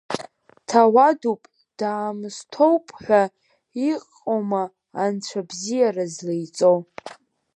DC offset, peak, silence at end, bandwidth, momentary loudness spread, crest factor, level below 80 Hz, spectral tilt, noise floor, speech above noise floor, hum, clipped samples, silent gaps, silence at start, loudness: under 0.1%; -2 dBFS; 0.4 s; 11.5 kHz; 15 LU; 20 dB; -72 dBFS; -5 dB/octave; -43 dBFS; 23 dB; none; under 0.1%; none; 0.1 s; -22 LUFS